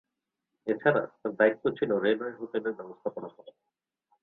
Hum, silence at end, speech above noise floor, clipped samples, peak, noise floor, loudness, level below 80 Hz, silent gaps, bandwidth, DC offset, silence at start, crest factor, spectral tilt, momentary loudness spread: none; 0.75 s; 57 dB; under 0.1%; -8 dBFS; -86 dBFS; -29 LUFS; -74 dBFS; none; 4.2 kHz; under 0.1%; 0.65 s; 22 dB; -9 dB/octave; 12 LU